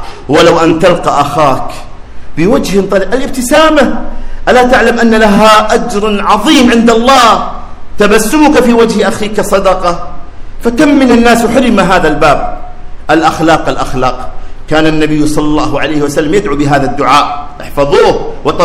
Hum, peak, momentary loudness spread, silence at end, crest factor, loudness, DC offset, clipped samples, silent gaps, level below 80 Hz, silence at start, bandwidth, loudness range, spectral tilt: none; 0 dBFS; 11 LU; 0 s; 8 dB; -8 LUFS; under 0.1%; 6%; none; -22 dBFS; 0 s; 16.5 kHz; 4 LU; -4.5 dB/octave